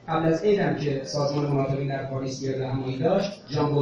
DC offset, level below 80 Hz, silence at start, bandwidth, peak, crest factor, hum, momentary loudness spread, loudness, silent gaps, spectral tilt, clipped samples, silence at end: under 0.1%; -54 dBFS; 0.05 s; 7.4 kHz; -10 dBFS; 14 dB; none; 7 LU; -26 LUFS; none; -7 dB/octave; under 0.1%; 0 s